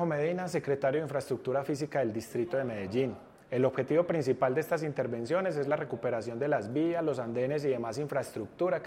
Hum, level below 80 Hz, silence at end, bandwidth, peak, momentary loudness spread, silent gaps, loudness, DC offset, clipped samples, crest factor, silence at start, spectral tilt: none; -70 dBFS; 0 s; 16 kHz; -16 dBFS; 5 LU; none; -32 LUFS; under 0.1%; under 0.1%; 16 dB; 0 s; -7 dB/octave